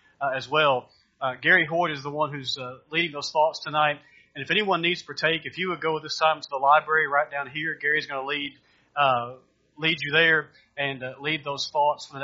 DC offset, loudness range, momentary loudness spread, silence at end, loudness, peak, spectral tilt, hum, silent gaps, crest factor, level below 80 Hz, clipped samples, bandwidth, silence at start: under 0.1%; 2 LU; 11 LU; 0 s; -24 LUFS; -6 dBFS; -1 dB/octave; none; none; 20 dB; -70 dBFS; under 0.1%; 7.6 kHz; 0.2 s